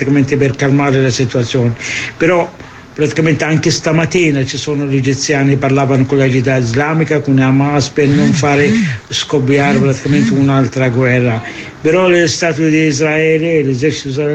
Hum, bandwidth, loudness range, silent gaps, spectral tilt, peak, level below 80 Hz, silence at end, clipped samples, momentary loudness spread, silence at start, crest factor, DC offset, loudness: none; 8.8 kHz; 2 LU; none; -5.5 dB/octave; 0 dBFS; -42 dBFS; 0 s; under 0.1%; 5 LU; 0 s; 12 dB; under 0.1%; -12 LUFS